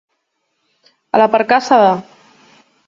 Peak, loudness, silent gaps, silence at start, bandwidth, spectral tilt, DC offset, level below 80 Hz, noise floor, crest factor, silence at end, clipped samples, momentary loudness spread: 0 dBFS; -13 LUFS; none; 1.15 s; 7.6 kHz; -5 dB/octave; under 0.1%; -64 dBFS; -69 dBFS; 16 dB; 0.85 s; under 0.1%; 7 LU